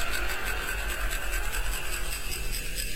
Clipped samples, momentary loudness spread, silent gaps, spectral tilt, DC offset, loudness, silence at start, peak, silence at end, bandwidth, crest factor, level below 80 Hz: under 0.1%; 2 LU; none; -2 dB/octave; 2%; -32 LUFS; 0 s; -16 dBFS; 0 s; 16 kHz; 16 dB; -34 dBFS